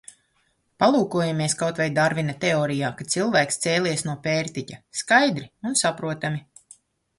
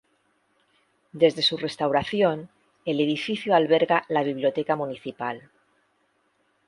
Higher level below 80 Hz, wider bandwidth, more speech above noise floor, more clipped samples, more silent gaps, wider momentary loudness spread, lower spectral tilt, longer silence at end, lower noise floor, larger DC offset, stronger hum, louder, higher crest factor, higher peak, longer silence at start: about the same, -62 dBFS vs -64 dBFS; about the same, 11.5 kHz vs 11.5 kHz; about the same, 45 dB vs 45 dB; neither; neither; about the same, 10 LU vs 12 LU; second, -4 dB/octave vs -5.5 dB/octave; second, 0.8 s vs 1.3 s; about the same, -68 dBFS vs -69 dBFS; neither; neither; about the same, -23 LUFS vs -24 LUFS; about the same, 20 dB vs 20 dB; about the same, -4 dBFS vs -6 dBFS; second, 0.8 s vs 1.15 s